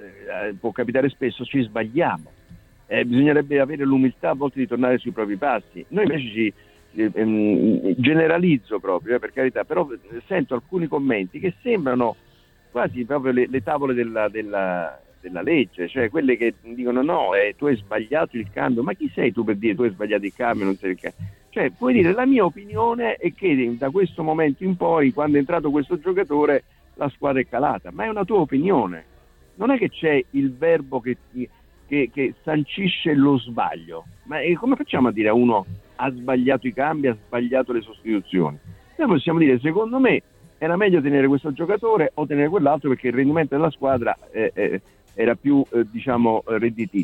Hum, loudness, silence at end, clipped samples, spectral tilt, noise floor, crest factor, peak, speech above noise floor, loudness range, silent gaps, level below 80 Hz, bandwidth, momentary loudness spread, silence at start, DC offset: none; -21 LUFS; 0 s; under 0.1%; -8.5 dB/octave; -48 dBFS; 18 dB; -4 dBFS; 27 dB; 3 LU; none; -54 dBFS; 4.7 kHz; 9 LU; 0 s; under 0.1%